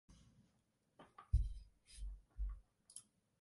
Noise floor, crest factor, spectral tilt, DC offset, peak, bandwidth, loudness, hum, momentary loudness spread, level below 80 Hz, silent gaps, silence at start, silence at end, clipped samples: -81 dBFS; 22 dB; -5.5 dB/octave; under 0.1%; -24 dBFS; 11.5 kHz; -48 LUFS; none; 24 LU; -48 dBFS; none; 0.1 s; 0.4 s; under 0.1%